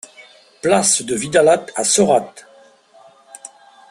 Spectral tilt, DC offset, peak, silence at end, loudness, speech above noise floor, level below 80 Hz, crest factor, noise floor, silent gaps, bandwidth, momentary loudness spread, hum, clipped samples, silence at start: -3 dB/octave; under 0.1%; -2 dBFS; 0.45 s; -15 LUFS; 33 dB; -58 dBFS; 18 dB; -48 dBFS; none; 12.5 kHz; 23 LU; none; under 0.1%; 0.2 s